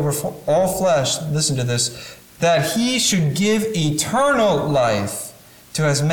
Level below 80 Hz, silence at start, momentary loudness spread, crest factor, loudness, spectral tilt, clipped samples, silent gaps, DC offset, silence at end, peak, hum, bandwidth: -50 dBFS; 0 s; 8 LU; 12 dB; -19 LUFS; -4 dB/octave; under 0.1%; none; under 0.1%; 0 s; -8 dBFS; none; 19 kHz